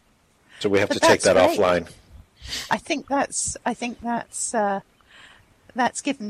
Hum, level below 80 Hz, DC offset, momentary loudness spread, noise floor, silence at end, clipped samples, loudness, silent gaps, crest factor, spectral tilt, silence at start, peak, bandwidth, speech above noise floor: none; -54 dBFS; under 0.1%; 14 LU; -60 dBFS; 0 s; under 0.1%; -22 LUFS; none; 20 dB; -3 dB/octave; 0.55 s; -4 dBFS; 15 kHz; 38 dB